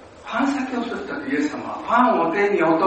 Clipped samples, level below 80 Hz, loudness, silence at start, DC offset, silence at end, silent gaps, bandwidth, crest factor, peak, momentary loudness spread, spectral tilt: under 0.1%; -58 dBFS; -21 LUFS; 0 s; under 0.1%; 0 s; none; 8.4 kHz; 16 dB; -4 dBFS; 11 LU; -5.5 dB/octave